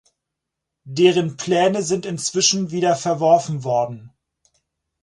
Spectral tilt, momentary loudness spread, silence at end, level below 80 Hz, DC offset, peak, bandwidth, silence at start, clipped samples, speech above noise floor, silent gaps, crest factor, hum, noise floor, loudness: -4 dB/octave; 7 LU; 0.95 s; -64 dBFS; under 0.1%; -2 dBFS; 11.5 kHz; 0.85 s; under 0.1%; 63 dB; none; 18 dB; none; -82 dBFS; -19 LUFS